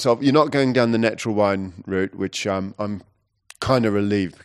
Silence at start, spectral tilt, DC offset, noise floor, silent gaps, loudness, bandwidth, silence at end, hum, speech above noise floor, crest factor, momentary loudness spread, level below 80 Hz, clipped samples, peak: 0 s; -6 dB/octave; under 0.1%; -51 dBFS; none; -21 LUFS; 13 kHz; 0.15 s; none; 31 dB; 18 dB; 11 LU; -54 dBFS; under 0.1%; -2 dBFS